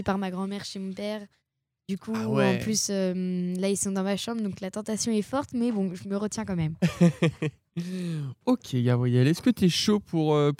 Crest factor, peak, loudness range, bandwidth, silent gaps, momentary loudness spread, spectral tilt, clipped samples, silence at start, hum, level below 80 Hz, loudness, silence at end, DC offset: 18 dB; -8 dBFS; 3 LU; 16 kHz; none; 11 LU; -5.5 dB/octave; under 0.1%; 0 s; none; -60 dBFS; -27 LUFS; 0.05 s; under 0.1%